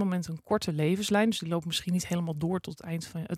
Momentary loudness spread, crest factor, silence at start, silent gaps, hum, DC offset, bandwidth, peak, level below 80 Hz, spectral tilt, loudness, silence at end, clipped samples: 10 LU; 14 dB; 0 s; none; none; under 0.1%; 15.5 kHz; -14 dBFS; -62 dBFS; -5.5 dB/octave; -30 LUFS; 0 s; under 0.1%